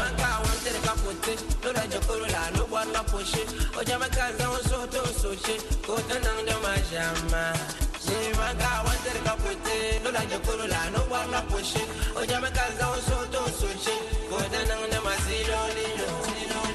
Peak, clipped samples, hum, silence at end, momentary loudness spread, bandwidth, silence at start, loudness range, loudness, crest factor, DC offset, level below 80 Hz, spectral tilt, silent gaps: -12 dBFS; under 0.1%; none; 0 s; 3 LU; 12.5 kHz; 0 s; 1 LU; -28 LUFS; 16 dB; under 0.1%; -32 dBFS; -3.5 dB/octave; none